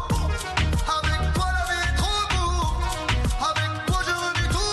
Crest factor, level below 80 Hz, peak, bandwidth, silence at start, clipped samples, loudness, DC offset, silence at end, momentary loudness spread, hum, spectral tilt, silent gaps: 14 dB; -28 dBFS; -10 dBFS; 12.5 kHz; 0 s; under 0.1%; -24 LUFS; under 0.1%; 0 s; 2 LU; none; -4 dB/octave; none